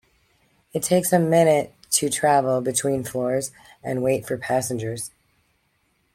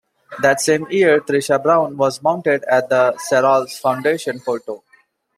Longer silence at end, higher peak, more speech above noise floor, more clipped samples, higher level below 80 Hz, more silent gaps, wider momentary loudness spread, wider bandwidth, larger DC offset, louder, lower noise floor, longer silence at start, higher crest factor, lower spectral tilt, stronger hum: first, 1.05 s vs 0.6 s; about the same, -4 dBFS vs -2 dBFS; first, 46 dB vs 40 dB; neither; first, -60 dBFS vs -66 dBFS; neither; first, 13 LU vs 9 LU; about the same, 16.5 kHz vs 15.5 kHz; neither; second, -22 LUFS vs -17 LUFS; first, -68 dBFS vs -56 dBFS; first, 0.75 s vs 0.3 s; about the same, 18 dB vs 16 dB; about the same, -4.5 dB/octave vs -4 dB/octave; neither